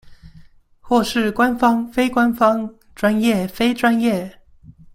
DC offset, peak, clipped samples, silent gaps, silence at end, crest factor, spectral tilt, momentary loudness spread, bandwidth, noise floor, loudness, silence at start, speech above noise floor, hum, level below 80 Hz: under 0.1%; -2 dBFS; under 0.1%; none; 0.25 s; 18 dB; -5.5 dB/octave; 7 LU; 16.5 kHz; -46 dBFS; -18 LUFS; 0.05 s; 29 dB; none; -48 dBFS